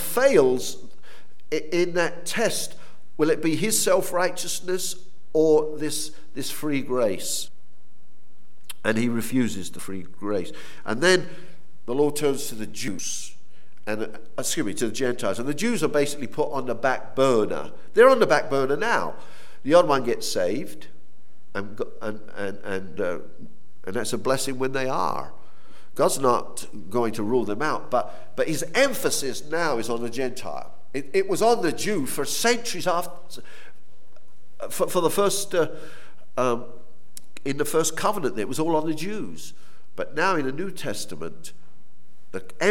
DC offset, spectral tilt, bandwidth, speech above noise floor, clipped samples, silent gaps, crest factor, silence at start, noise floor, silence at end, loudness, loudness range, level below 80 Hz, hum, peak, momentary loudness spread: 5%; -3.5 dB/octave; 17.5 kHz; 38 dB; under 0.1%; none; 22 dB; 0 s; -63 dBFS; 0 s; -25 LUFS; 7 LU; -66 dBFS; none; -4 dBFS; 16 LU